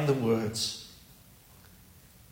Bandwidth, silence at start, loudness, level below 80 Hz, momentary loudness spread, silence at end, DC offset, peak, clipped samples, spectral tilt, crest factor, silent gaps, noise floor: 16.5 kHz; 0 s; -30 LUFS; -62 dBFS; 22 LU; 1.35 s; under 0.1%; -14 dBFS; under 0.1%; -5 dB/octave; 18 dB; none; -56 dBFS